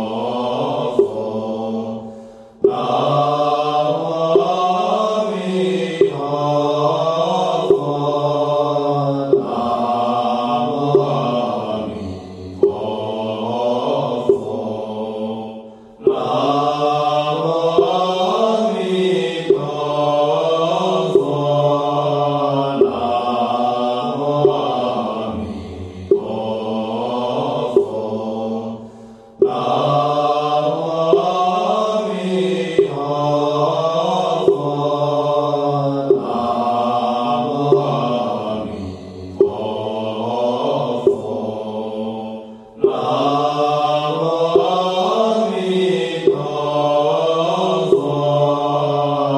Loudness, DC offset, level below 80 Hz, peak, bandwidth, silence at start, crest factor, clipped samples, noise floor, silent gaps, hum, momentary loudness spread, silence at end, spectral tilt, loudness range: -18 LUFS; under 0.1%; -56 dBFS; 0 dBFS; 10.5 kHz; 0 s; 18 dB; under 0.1%; -39 dBFS; none; none; 8 LU; 0 s; -6.5 dB/octave; 4 LU